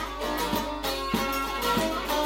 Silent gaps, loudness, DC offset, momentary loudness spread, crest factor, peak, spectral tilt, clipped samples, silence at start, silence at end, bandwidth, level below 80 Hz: none; -28 LUFS; under 0.1%; 4 LU; 16 dB; -12 dBFS; -3.5 dB/octave; under 0.1%; 0 s; 0 s; 16.5 kHz; -42 dBFS